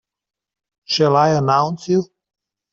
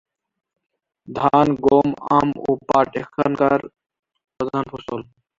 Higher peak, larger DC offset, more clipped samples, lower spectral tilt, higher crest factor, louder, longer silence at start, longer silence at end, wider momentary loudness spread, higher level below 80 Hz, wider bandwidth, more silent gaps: about the same, -4 dBFS vs -2 dBFS; neither; neither; second, -6 dB/octave vs -7.5 dB/octave; about the same, 16 dB vs 20 dB; about the same, -17 LUFS vs -19 LUFS; second, 0.9 s vs 1.1 s; first, 0.7 s vs 0.35 s; second, 7 LU vs 13 LU; second, -62 dBFS vs -52 dBFS; about the same, 7.8 kHz vs 7.6 kHz; second, none vs 3.99-4.03 s